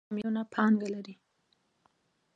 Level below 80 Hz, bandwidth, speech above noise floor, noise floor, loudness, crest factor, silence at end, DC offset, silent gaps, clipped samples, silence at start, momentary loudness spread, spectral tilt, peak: -80 dBFS; 7.6 kHz; 44 dB; -74 dBFS; -30 LUFS; 20 dB; 1.25 s; under 0.1%; none; under 0.1%; 0.1 s; 14 LU; -7.5 dB/octave; -14 dBFS